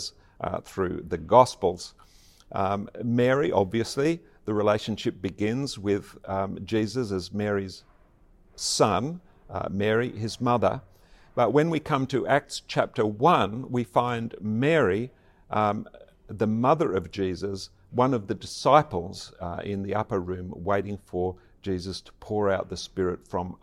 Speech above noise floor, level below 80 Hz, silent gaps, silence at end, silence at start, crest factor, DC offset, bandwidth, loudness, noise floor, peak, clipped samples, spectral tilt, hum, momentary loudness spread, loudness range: 31 dB; -56 dBFS; none; 0.05 s; 0 s; 24 dB; under 0.1%; 15 kHz; -27 LUFS; -57 dBFS; -4 dBFS; under 0.1%; -5.5 dB/octave; none; 13 LU; 5 LU